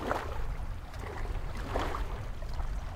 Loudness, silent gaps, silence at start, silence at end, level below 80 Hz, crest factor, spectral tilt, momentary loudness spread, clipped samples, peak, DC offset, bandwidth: -39 LUFS; none; 0 s; 0 s; -36 dBFS; 20 dB; -6 dB/octave; 7 LU; under 0.1%; -16 dBFS; under 0.1%; 15.5 kHz